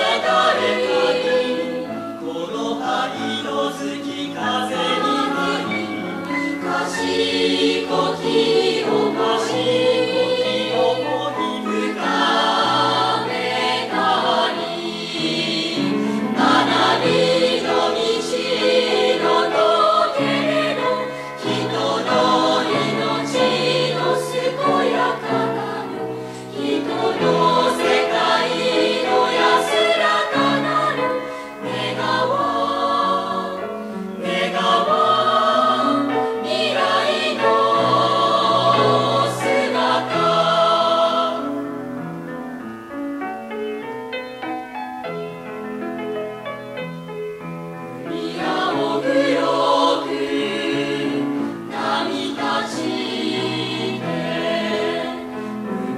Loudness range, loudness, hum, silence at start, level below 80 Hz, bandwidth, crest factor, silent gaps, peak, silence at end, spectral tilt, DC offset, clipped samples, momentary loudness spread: 7 LU; -19 LUFS; none; 0 s; -62 dBFS; 14.5 kHz; 16 dB; none; -4 dBFS; 0 s; -4.5 dB/octave; under 0.1%; under 0.1%; 12 LU